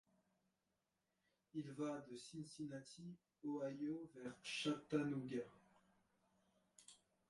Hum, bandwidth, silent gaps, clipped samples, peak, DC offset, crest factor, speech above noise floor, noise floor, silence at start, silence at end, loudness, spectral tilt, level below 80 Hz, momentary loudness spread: none; 11.5 kHz; none; under 0.1%; -28 dBFS; under 0.1%; 24 dB; 42 dB; -89 dBFS; 1.55 s; 0.35 s; -48 LUFS; -5 dB/octave; -86 dBFS; 16 LU